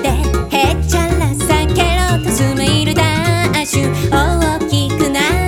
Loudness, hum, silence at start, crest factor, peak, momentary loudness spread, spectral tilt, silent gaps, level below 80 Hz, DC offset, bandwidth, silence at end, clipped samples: -14 LUFS; none; 0 s; 14 dB; 0 dBFS; 2 LU; -5 dB/octave; none; -22 dBFS; under 0.1%; 18 kHz; 0 s; under 0.1%